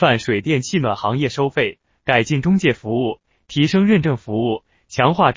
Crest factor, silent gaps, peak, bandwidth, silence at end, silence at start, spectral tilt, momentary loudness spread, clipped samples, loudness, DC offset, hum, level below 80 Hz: 16 dB; none; -2 dBFS; 7.6 kHz; 0 s; 0 s; -6 dB/octave; 10 LU; under 0.1%; -19 LUFS; under 0.1%; none; -50 dBFS